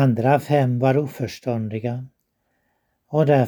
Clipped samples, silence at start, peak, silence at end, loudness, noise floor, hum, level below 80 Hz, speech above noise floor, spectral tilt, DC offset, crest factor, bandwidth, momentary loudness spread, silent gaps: under 0.1%; 0 s; -4 dBFS; 0 s; -21 LUFS; -71 dBFS; none; -62 dBFS; 52 dB; -8 dB/octave; under 0.1%; 18 dB; 19.5 kHz; 10 LU; none